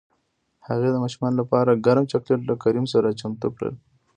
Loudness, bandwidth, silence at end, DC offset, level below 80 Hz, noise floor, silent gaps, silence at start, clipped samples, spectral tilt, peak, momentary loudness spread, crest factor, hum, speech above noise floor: -22 LUFS; 9.6 kHz; 0.4 s; under 0.1%; -60 dBFS; -70 dBFS; none; 0.65 s; under 0.1%; -7.5 dB/octave; -4 dBFS; 10 LU; 18 dB; none; 49 dB